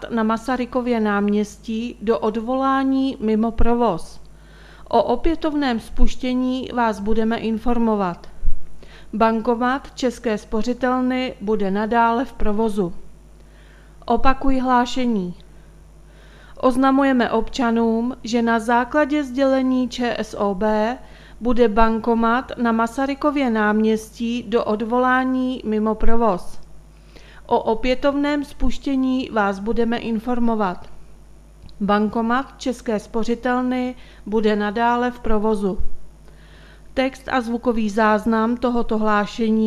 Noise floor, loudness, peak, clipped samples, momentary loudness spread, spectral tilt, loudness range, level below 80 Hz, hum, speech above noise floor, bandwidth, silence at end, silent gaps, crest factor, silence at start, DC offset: -45 dBFS; -21 LUFS; 0 dBFS; under 0.1%; 7 LU; -6 dB/octave; 3 LU; -34 dBFS; none; 26 dB; 12 kHz; 0 s; none; 20 dB; 0 s; under 0.1%